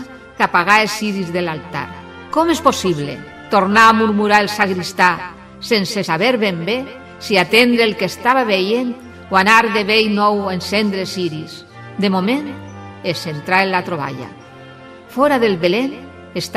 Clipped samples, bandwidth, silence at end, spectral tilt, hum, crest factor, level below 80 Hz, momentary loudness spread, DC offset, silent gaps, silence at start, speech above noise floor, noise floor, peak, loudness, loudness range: under 0.1%; 15.5 kHz; 0 s; -4.5 dB/octave; none; 16 dB; -54 dBFS; 19 LU; under 0.1%; none; 0 s; 22 dB; -38 dBFS; 0 dBFS; -16 LUFS; 6 LU